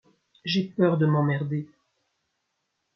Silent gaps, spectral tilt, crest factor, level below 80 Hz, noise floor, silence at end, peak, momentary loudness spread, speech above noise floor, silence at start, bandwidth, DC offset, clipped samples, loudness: none; -8 dB/octave; 18 dB; -70 dBFS; -78 dBFS; 1.3 s; -10 dBFS; 13 LU; 54 dB; 0.45 s; 6.6 kHz; under 0.1%; under 0.1%; -25 LUFS